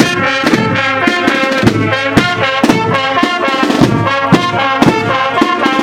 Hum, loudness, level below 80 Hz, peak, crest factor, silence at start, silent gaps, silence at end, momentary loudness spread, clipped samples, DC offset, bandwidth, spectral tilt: none; -11 LUFS; -38 dBFS; 0 dBFS; 12 dB; 0 s; none; 0 s; 2 LU; 0.6%; under 0.1%; 17 kHz; -5 dB/octave